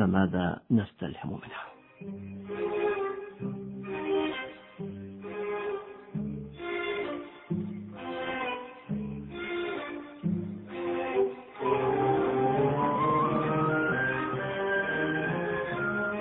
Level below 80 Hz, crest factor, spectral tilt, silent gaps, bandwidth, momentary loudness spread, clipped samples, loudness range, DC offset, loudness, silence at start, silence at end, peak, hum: -60 dBFS; 20 dB; -10.5 dB/octave; none; 4 kHz; 14 LU; under 0.1%; 8 LU; under 0.1%; -31 LUFS; 0 s; 0 s; -10 dBFS; none